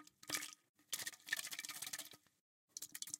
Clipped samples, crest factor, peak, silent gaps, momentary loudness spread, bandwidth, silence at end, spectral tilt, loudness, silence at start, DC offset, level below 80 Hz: under 0.1%; 28 dB; -22 dBFS; 0.69-0.74 s, 2.41-2.68 s; 13 LU; 17 kHz; 0 s; 1 dB/octave; -46 LUFS; 0 s; under 0.1%; under -90 dBFS